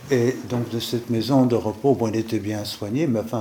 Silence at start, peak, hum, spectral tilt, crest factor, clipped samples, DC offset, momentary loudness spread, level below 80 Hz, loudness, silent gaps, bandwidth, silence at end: 0 s; -6 dBFS; none; -6.5 dB/octave; 18 dB; under 0.1%; under 0.1%; 8 LU; -62 dBFS; -23 LUFS; none; 19 kHz; 0 s